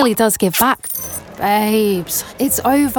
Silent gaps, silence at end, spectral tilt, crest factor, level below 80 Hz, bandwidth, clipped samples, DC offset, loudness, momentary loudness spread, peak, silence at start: none; 0 s; -3.5 dB/octave; 14 dB; -46 dBFS; 19.5 kHz; under 0.1%; under 0.1%; -16 LUFS; 8 LU; -2 dBFS; 0 s